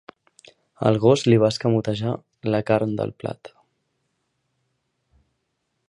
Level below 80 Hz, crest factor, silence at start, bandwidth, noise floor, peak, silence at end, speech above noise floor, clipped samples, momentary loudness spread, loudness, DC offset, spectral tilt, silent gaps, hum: -58 dBFS; 22 dB; 0.8 s; 11 kHz; -75 dBFS; -2 dBFS; 2.4 s; 55 dB; under 0.1%; 13 LU; -21 LUFS; under 0.1%; -7 dB/octave; none; none